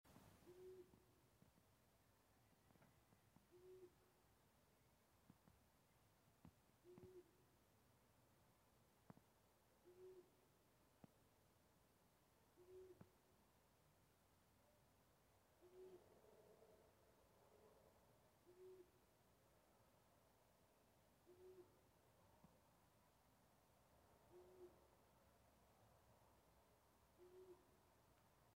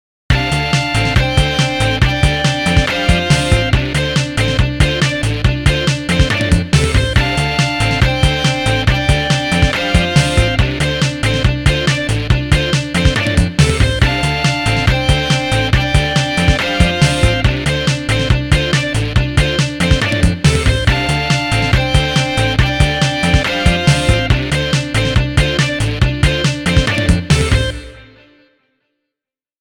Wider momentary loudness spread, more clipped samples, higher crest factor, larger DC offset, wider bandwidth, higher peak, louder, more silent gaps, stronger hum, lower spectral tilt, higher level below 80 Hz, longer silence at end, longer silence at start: about the same, 4 LU vs 3 LU; neither; first, 22 dB vs 14 dB; second, under 0.1% vs 0.2%; second, 15.5 kHz vs 18 kHz; second, -50 dBFS vs 0 dBFS; second, -67 LUFS vs -14 LUFS; neither; neither; about the same, -5.5 dB/octave vs -5 dB/octave; second, -88 dBFS vs -20 dBFS; second, 0 s vs 1.55 s; second, 0.05 s vs 0.3 s